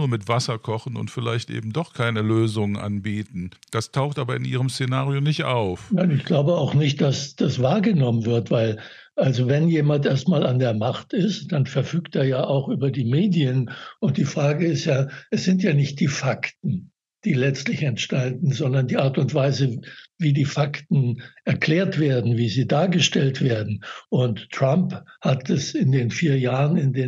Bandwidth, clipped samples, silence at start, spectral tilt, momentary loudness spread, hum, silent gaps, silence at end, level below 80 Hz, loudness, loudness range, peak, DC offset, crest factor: 10 kHz; under 0.1%; 0 s; -6.5 dB/octave; 8 LU; none; none; 0 s; -64 dBFS; -22 LUFS; 4 LU; -8 dBFS; under 0.1%; 14 dB